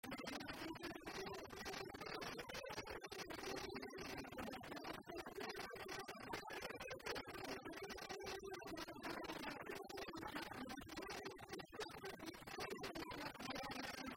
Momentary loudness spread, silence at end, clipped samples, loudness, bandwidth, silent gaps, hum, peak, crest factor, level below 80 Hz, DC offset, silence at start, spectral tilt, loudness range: 3 LU; 0 s; under 0.1%; -50 LUFS; 16 kHz; none; none; -34 dBFS; 18 dB; -70 dBFS; under 0.1%; 0.05 s; -3.5 dB/octave; 1 LU